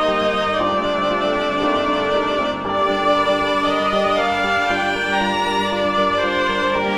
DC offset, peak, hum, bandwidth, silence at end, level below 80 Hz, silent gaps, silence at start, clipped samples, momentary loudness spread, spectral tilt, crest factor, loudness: under 0.1%; -6 dBFS; none; 13.5 kHz; 0 s; -46 dBFS; none; 0 s; under 0.1%; 2 LU; -4.5 dB/octave; 12 dB; -18 LUFS